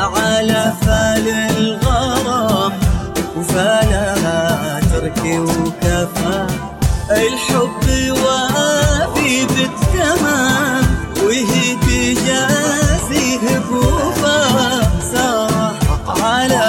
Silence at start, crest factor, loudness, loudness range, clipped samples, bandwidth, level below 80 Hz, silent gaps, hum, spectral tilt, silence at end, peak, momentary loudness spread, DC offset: 0 s; 14 dB; -15 LUFS; 2 LU; under 0.1%; 17 kHz; -24 dBFS; none; none; -4.5 dB/octave; 0 s; 0 dBFS; 4 LU; under 0.1%